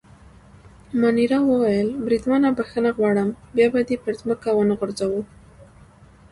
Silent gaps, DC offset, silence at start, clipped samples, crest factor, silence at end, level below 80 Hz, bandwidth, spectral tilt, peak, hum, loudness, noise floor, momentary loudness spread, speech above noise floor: none; under 0.1%; 0.9 s; under 0.1%; 16 dB; 0.7 s; -52 dBFS; 11.5 kHz; -7 dB/octave; -6 dBFS; none; -21 LUFS; -49 dBFS; 7 LU; 29 dB